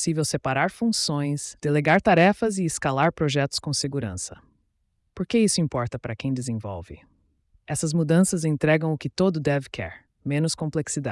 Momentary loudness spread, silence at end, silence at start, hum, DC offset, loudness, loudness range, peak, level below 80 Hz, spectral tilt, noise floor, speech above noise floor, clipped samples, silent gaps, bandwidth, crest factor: 12 LU; 0 s; 0 s; none; under 0.1%; -24 LUFS; 5 LU; -8 dBFS; -54 dBFS; -5 dB/octave; -71 dBFS; 48 dB; under 0.1%; none; 12 kHz; 16 dB